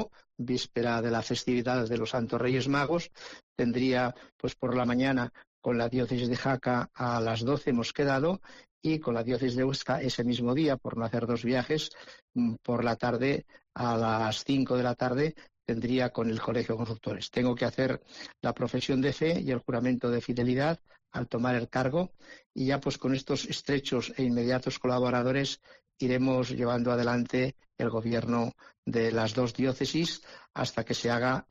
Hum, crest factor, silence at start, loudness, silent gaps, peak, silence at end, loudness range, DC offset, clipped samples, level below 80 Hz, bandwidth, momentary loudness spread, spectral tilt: none; 12 dB; 0 s; -30 LUFS; 3.43-3.56 s, 4.32-4.39 s, 5.47-5.62 s, 8.71-8.81 s, 12.22-12.28 s, 22.46-22.50 s, 28.78-28.83 s; -18 dBFS; 0.1 s; 1 LU; under 0.1%; under 0.1%; -58 dBFS; 7.8 kHz; 7 LU; -6 dB/octave